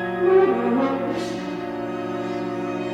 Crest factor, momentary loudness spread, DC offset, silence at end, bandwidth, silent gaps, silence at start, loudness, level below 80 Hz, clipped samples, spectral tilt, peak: 16 dB; 11 LU; under 0.1%; 0 s; 9.6 kHz; none; 0 s; -23 LUFS; -58 dBFS; under 0.1%; -6.5 dB/octave; -8 dBFS